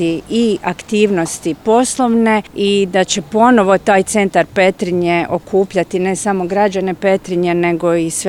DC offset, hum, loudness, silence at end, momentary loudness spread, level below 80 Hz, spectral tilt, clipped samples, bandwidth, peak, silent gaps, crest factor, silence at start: 0.1%; none; -14 LUFS; 0 s; 5 LU; -48 dBFS; -4.5 dB/octave; under 0.1%; 16 kHz; 0 dBFS; none; 14 dB; 0 s